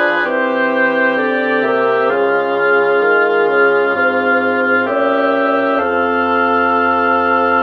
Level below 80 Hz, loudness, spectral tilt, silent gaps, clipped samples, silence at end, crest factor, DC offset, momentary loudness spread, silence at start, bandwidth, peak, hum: -56 dBFS; -14 LUFS; -6.5 dB/octave; none; under 0.1%; 0 s; 12 dB; under 0.1%; 2 LU; 0 s; 6 kHz; -2 dBFS; none